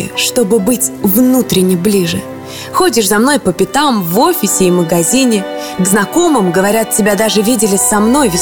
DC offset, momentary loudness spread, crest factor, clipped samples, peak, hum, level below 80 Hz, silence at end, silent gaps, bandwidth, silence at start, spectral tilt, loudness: under 0.1%; 4 LU; 10 dB; under 0.1%; 0 dBFS; none; -42 dBFS; 0 s; none; over 20 kHz; 0 s; -4 dB/octave; -11 LUFS